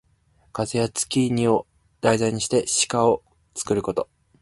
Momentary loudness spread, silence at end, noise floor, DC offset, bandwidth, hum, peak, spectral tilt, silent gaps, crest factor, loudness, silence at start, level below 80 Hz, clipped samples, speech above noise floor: 11 LU; 0.4 s; -61 dBFS; under 0.1%; 11.5 kHz; none; -2 dBFS; -4 dB/octave; none; 22 dB; -23 LUFS; 0.55 s; -54 dBFS; under 0.1%; 39 dB